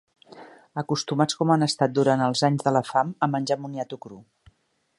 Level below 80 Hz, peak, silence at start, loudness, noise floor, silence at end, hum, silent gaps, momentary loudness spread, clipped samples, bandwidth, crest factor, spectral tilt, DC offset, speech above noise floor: -68 dBFS; -6 dBFS; 0.3 s; -24 LUFS; -63 dBFS; 0.75 s; none; none; 13 LU; under 0.1%; 11.5 kHz; 20 dB; -5.5 dB/octave; under 0.1%; 39 dB